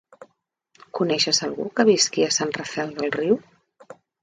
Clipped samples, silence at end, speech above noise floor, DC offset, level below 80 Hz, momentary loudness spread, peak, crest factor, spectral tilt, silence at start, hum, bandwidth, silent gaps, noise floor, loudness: under 0.1%; 0.3 s; 47 dB; under 0.1%; -66 dBFS; 9 LU; -6 dBFS; 20 dB; -2.5 dB/octave; 0.2 s; none; 9.6 kHz; none; -69 dBFS; -22 LUFS